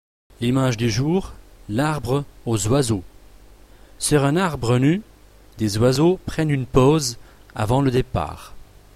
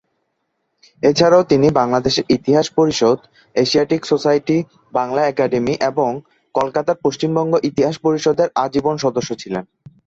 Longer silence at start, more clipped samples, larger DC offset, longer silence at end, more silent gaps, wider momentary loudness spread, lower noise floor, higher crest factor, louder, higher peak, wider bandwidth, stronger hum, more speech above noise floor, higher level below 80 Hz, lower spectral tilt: second, 0.4 s vs 1.05 s; neither; neither; about the same, 0.35 s vs 0.45 s; neither; about the same, 10 LU vs 9 LU; second, -46 dBFS vs -71 dBFS; about the same, 18 dB vs 16 dB; second, -21 LUFS vs -17 LUFS; about the same, -2 dBFS vs 0 dBFS; first, 15 kHz vs 7.8 kHz; neither; second, 27 dB vs 55 dB; first, -40 dBFS vs -52 dBFS; about the same, -6 dB/octave vs -5.5 dB/octave